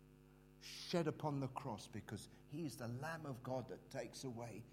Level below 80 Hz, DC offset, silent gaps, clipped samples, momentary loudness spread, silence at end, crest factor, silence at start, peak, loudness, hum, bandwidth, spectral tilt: -72 dBFS; under 0.1%; none; under 0.1%; 12 LU; 0 s; 22 dB; 0 s; -26 dBFS; -47 LUFS; none; 16 kHz; -5.5 dB/octave